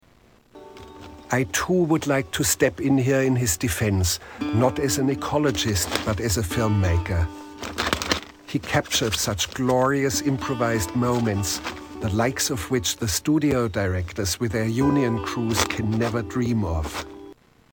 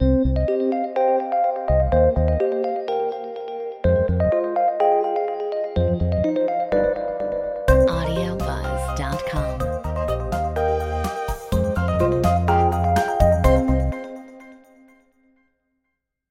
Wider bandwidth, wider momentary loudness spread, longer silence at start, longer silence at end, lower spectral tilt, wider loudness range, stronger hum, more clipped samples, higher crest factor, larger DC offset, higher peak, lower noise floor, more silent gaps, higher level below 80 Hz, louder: first, 20 kHz vs 16 kHz; about the same, 8 LU vs 8 LU; first, 0.55 s vs 0 s; second, 0.4 s vs 1.75 s; second, -4.5 dB/octave vs -7.5 dB/octave; about the same, 2 LU vs 4 LU; neither; neither; about the same, 22 dB vs 18 dB; neither; about the same, -2 dBFS vs -2 dBFS; second, -56 dBFS vs -78 dBFS; neither; second, -40 dBFS vs -28 dBFS; about the same, -23 LUFS vs -21 LUFS